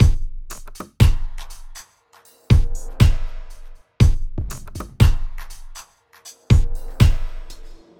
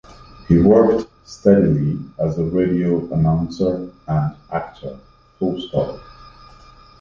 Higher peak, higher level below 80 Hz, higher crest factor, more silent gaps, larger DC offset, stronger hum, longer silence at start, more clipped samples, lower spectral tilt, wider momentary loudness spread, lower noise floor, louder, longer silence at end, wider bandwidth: about the same, 0 dBFS vs -2 dBFS; first, -22 dBFS vs -40 dBFS; about the same, 18 dB vs 18 dB; neither; neither; neither; about the same, 0 s vs 0.1 s; neither; second, -6.5 dB/octave vs -9 dB/octave; first, 22 LU vs 14 LU; first, -53 dBFS vs -45 dBFS; about the same, -20 LUFS vs -18 LUFS; second, 0.25 s vs 0.7 s; first, 16.5 kHz vs 7.2 kHz